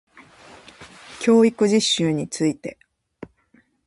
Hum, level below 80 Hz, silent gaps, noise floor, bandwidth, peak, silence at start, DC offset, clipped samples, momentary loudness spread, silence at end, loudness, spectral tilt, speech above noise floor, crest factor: none; -62 dBFS; none; -60 dBFS; 11.5 kHz; -6 dBFS; 0.8 s; under 0.1%; under 0.1%; 18 LU; 1.15 s; -19 LUFS; -4.5 dB/octave; 41 dB; 18 dB